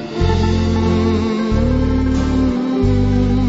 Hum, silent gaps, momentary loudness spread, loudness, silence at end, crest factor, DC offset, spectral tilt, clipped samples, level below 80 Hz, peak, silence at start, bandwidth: none; none; 2 LU; -16 LUFS; 0 s; 12 dB; under 0.1%; -7.5 dB/octave; under 0.1%; -22 dBFS; -2 dBFS; 0 s; 8 kHz